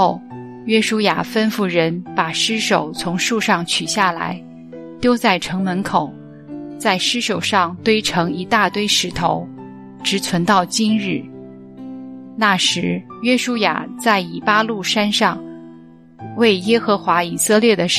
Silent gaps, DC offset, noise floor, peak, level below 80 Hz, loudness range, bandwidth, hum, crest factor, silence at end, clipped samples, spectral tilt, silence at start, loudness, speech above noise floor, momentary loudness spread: none; 0.1%; -42 dBFS; 0 dBFS; -56 dBFS; 2 LU; 15 kHz; none; 18 dB; 0 s; under 0.1%; -3.5 dB/octave; 0 s; -17 LUFS; 25 dB; 18 LU